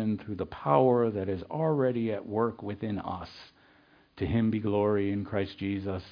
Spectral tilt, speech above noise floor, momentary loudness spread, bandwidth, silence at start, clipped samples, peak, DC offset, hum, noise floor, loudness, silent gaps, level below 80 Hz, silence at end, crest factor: -10 dB/octave; 32 dB; 12 LU; 5.2 kHz; 0 s; under 0.1%; -10 dBFS; under 0.1%; none; -61 dBFS; -30 LUFS; none; -56 dBFS; 0 s; 20 dB